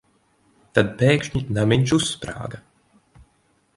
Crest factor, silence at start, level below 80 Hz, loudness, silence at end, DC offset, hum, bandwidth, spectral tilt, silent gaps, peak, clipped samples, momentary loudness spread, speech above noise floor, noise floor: 22 dB; 0.75 s; -48 dBFS; -21 LUFS; 1.2 s; under 0.1%; none; 11.5 kHz; -5.5 dB/octave; none; 0 dBFS; under 0.1%; 15 LU; 43 dB; -64 dBFS